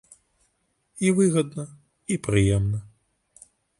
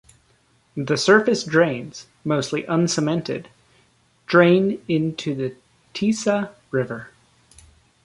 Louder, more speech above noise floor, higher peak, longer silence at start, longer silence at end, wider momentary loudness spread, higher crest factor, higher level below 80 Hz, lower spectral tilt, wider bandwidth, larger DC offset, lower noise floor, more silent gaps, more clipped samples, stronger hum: second, -24 LUFS vs -21 LUFS; first, 49 dB vs 40 dB; second, -6 dBFS vs -2 dBFS; first, 0.95 s vs 0.75 s; about the same, 0.9 s vs 0.95 s; about the same, 16 LU vs 16 LU; about the same, 20 dB vs 20 dB; first, -44 dBFS vs -60 dBFS; about the same, -6 dB/octave vs -5 dB/octave; about the same, 11.5 kHz vs 11.5 kHz; neither; first, -71 dBFS vs -61 dBFS; neither; neither; neither